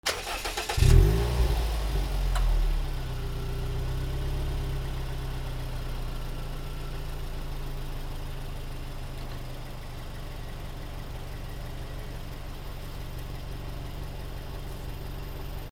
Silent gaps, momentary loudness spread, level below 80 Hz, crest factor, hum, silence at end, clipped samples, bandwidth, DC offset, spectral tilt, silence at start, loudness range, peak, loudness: none; 13 LU; -32 dBFS; 24 dB; none; 0 s; under 0.1%; 16.5 kHz; under 0.1%; -5 dB/octave; 0.05 s; 13 LU; -6 dBFS; -33 LUFS